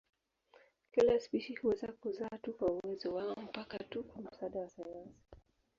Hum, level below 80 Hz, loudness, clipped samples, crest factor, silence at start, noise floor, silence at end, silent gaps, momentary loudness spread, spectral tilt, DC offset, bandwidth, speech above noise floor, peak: none; -68 dBFS; -38 LUFS; under 0.1%; 20 dB; 0.95 s; -68 dBFS; 0.4 s; none; 17 LU; -4.5 dB/octave; under 0.1%; 7.4 kHz; 30 dB; -18 dBFS